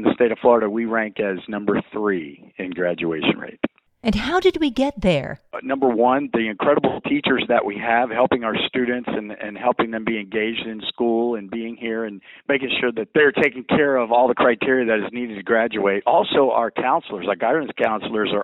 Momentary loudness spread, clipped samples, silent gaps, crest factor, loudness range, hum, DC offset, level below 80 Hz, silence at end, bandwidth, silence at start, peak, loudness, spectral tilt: 11 LU; under 0.1%; none; 18 dB; 5 LU; none; under 0.1%; -48 dBFS; 0 s; 10 kHz; 0 s; -2 dBFS; -20 LUFS; -6.5 dB/octave